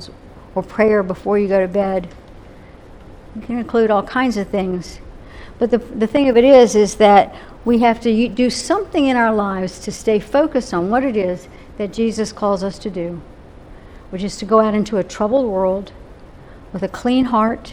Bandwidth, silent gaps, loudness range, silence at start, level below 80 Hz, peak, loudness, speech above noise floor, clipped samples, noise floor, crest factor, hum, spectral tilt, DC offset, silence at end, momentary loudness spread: 12.5 kHz; none; 8 LU; 0 s; -42 dBFS; 0 dBFS; -17 LUFS; 23 dB; under 0.1%; -40 dBFS; 18 dB; none; -5.5 dB/octave; under 0.1%; 0 s; 14 LU